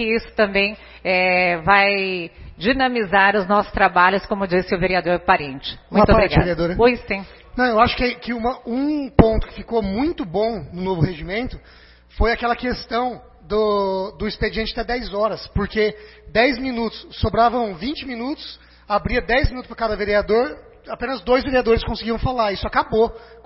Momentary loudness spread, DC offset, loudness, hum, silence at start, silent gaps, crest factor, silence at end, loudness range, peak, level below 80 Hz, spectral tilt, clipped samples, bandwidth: 12 LU; under 0.1%; -20 LUFS; none; 0 s; none; 20 dB; 0.1 s; 5 LU; 0 dBFS; -32 dBFS; -9.5 dB/octave; under 0.1%; 5.8 kHz